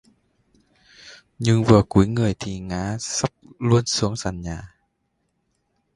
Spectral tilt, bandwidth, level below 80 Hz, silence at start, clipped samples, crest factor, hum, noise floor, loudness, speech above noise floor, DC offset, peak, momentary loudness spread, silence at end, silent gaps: -5.5 dB/octave; 11.5 kHz; -44 dBFS; 1.05 s; under 0.1%; 22 dB; none; -72 dBFS; -21 LUFS; 52 dB; under 0.1%; 0 dBFS; 14 LU; 1.3 s; none